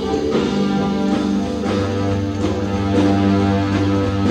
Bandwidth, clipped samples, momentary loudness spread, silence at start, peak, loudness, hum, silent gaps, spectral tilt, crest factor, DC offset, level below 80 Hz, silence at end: 9.6 kHz; under 0.1%; 5 LU; 0 s; -4 dBFS; -18 LUFS; none; none; -7 dB/octave; 14 dB; under 0.1%; -38 dBFS; 0 s